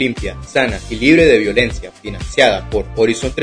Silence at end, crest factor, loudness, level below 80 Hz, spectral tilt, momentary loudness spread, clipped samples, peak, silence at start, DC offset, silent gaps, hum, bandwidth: 0 s; 14 dB; -14 LUFS; -30 dBFS; -5 dB/octave; 15 LU; under 0.1%; 0 dBFS; 0 s; under 0.1%; none; none; 10.5 kHz